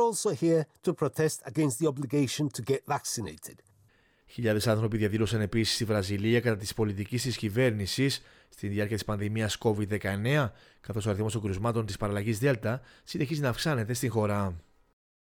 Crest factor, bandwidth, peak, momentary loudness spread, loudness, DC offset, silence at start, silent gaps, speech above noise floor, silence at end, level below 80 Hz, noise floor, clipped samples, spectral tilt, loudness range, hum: 16 dB; over 20 kHz; -12 dBFS; 8 LU; -29 LUFS; under 0.1%; 0 s; none; 35 dB; 0.65 s; -56 dBFS; -65 dBFS; under 0.1%; -5.5 dB/octave; 3 LU; none